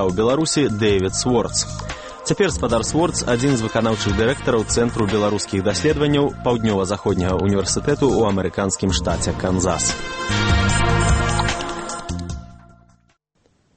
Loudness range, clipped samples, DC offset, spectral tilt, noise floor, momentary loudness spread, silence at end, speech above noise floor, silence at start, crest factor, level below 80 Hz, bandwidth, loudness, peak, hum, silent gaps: 1 LU; under 0.1%; under 0.1%; -4.5 dB/octave; -63 dBFS; 8 LU; 1.2 s; 44 dB; 0 s; 16 dB; -32 dBFS; 8.8 kHz; -19 LUFS; -4 dBFS; none; none